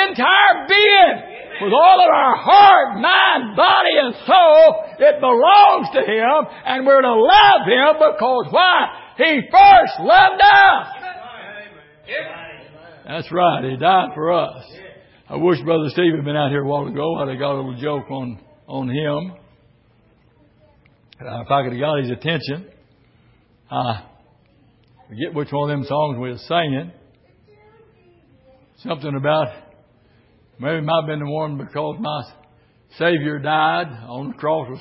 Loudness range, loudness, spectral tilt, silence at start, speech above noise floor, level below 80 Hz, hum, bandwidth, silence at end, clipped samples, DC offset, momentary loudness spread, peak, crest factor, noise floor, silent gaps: 15 LU; -14 LUFS; -9 dB/octave; 0 s; 40 dB; -54 dBFS; none; 5.8 kHz; 0 s; under 0.1%; under 0.1%; 20 LU; 0 dBFS; 16 dB; -55 dBFS; none